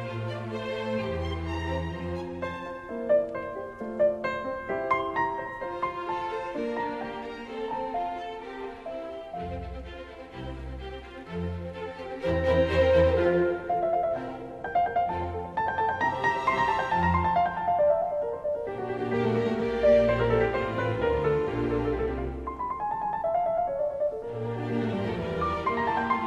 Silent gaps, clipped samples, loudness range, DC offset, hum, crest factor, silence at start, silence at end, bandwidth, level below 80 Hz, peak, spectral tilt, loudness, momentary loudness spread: none; under 0.1%; 10 LU; under 0.1%; none; 18 dB; 0 s; 0 s; 10.5 kHz; -42 dBFS; -10 dBFS; -7.5 dB/octave; -28 LUFS; 13 LU